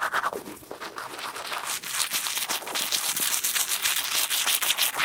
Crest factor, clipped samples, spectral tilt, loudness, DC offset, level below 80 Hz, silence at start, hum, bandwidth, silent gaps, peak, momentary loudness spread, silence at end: 24 dB; under 0.1%; 1.5 dB/octave; -25 LUFS; under 0.1%; -70 dBFS; 0 s; none; 19 kHz; none; -4 dBFS; 14 LU; 0 s